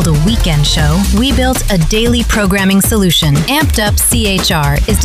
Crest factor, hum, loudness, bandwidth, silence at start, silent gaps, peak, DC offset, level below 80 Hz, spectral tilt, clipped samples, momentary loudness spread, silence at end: 10 dB; none; -11 LUFS; 16 kHz; 0 s; none; -2 dBFS; under 0.1%; -16 dBFS; -4 dB/octave; under 0.1%; 3 LU; 0 s